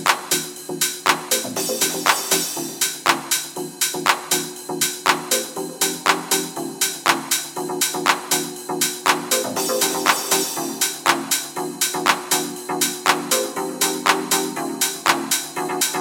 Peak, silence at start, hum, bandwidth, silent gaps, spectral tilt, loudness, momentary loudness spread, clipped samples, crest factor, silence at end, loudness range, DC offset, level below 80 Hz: 0 dBFS; 0 s; none; 17 kHz; none; -1 dB/octave; -20 LUFS; 4 LU; under 0.1%; 22 dB; 0 s; 1 LU; under 0.1%; -68 dBFS